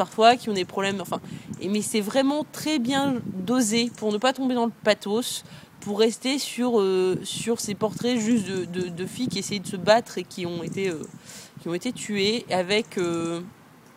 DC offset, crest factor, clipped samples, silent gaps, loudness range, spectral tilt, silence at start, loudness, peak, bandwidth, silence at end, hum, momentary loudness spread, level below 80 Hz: under 0.1%; 22 dB; under 0.1%; none; 3 LU; -4 dB/octave; 0 s; -25 LUFS; -4 dBFS; 16 kHz; 0.45 s; none; 11 LU; -66 dBFS